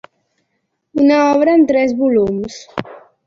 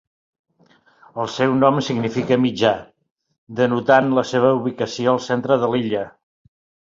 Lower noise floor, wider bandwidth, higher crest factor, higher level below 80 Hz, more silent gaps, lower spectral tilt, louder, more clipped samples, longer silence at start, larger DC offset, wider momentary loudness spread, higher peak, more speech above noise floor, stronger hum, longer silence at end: first, -70 dBFS vs -56 dBFS; about the same, 7.6 kHz vs 7.6 kHz; about the same, 14 dB vs 18 dB; first, -52 dBFS vs -58 dBFS; second, none vs 3.11-3.16 s, 3.38-3.47 s; about the same, -6 dB/octave vs -6 dB/octave; first, -14 LUFS vs -19 LUFS; neither; second, 0.95 s vs 1.15 s; neither; first, 15 LU vs 11 LU; about the same, -2 dBFS vs -2 dBFS; first, 57 dB vs 38 dB; neither; second, 0.3 s vs 0.8 s